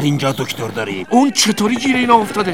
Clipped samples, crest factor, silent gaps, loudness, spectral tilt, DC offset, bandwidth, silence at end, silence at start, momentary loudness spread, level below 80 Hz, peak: under 0.1%; 16 dB; none; -15 LUFS; -4 dB/octave; 0.7%; 17 kHz; 0 s; 0 s; 9 LU; -54 dBFS; 0 dBFS